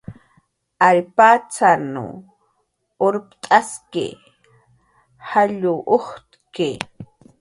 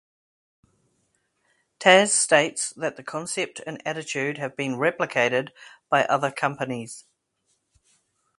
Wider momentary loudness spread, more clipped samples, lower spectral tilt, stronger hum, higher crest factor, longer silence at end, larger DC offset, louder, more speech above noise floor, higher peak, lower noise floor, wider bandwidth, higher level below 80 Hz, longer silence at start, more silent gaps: first, 18 LU vs 15 LU; neither; first, -4.5 dB/octave vs -2.5 dB/octave; neither; second, 20 dB vs 26 dB; second, 0.35 s vs 1.4 s; neither; first, -18 LUFS vs -23 LUFS; about the same, 51 dB vs 49 dB; about the same, 0 dBFS vs 0 dBFS; second, -69 dBFS vs -73 dBFS; about the same, 11.5 kHz vs 11.5 kHz; first, -62 dBFS vs -72 dBFS; second, 0.1 s vs 1.8 s; neither